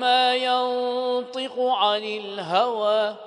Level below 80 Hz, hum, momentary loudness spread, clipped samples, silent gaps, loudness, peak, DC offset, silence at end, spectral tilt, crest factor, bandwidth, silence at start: -82 dBFS; none; 8 LU; under 0.1%; none; -23 LUFS; -8 dBFS; under 0.1%; 0 s; -3.5 dB/octave; 16 dB; 10.5 kHz; 0 s